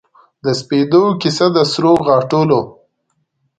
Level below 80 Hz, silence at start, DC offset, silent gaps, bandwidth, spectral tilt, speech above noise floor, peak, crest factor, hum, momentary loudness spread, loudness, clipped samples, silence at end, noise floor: -54 dBFS; 0.45 s; under 0.1%; none; 9.2 kHz; -6 dB/octave; 54 dB; 0 dBFS; 14 dB; none; 8 LU; -14 LUFS; under 0.1%; 0.9 s; -67 dBFS